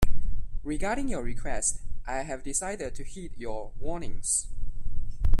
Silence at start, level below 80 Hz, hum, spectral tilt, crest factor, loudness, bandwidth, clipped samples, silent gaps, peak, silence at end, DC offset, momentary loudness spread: 0 s; -32 dBFS; none; -4 dB/octave; 16 dB; -33 LUFS; 11.5 kHz; under 0.1%; none; -6 dBFS; 0 s; under 0.1%; 13 LU